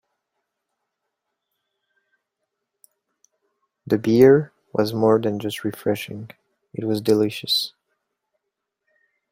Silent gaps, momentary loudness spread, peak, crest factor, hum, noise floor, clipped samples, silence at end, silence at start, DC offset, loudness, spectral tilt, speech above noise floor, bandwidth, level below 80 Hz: none; 17 LU; -2 dBFS; 22 dB; none; -81 dBFS; under 0.1%; 1.65 s; 3.85 s; under 0.1%; -20 LUFS; -6 dB/octave; 61 dB; 16 kHz; -62 dBFS